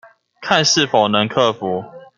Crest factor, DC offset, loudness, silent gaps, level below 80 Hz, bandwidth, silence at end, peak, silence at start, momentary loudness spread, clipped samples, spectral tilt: 16 dB; under 0.1%; -16 LUFS; none; -60 dBFS; 11 kHz; 0.15 s; -2 dBFS; 0.4 s; 11 LU; under 0.1%; -3 dB/octave